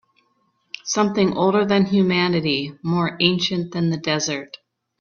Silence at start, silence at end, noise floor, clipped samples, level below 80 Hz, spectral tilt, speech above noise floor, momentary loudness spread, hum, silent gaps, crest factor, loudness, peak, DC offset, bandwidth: 0.85 s; 0.45 s; -66 dBFS; under 0.1%; -58 dBFS; -5 dB/octave; 46 dB; 8 LU; none; none; 20 dB; -20 LUFS; 0 dBFS; under 0.1%; 7.2 kHz